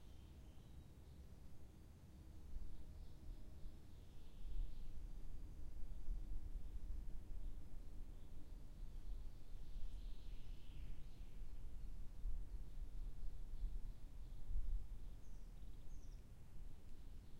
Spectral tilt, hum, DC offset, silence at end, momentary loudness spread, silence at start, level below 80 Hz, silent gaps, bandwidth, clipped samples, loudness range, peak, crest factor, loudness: -6.5 dB/octave; none; under 0.1%; 0 s; 9 LU; 0 s; -50 dBFS; none; 6.8 kHz; under 0.1%; 6 LU; -32 dBFS; 14 dB; -58 LUFS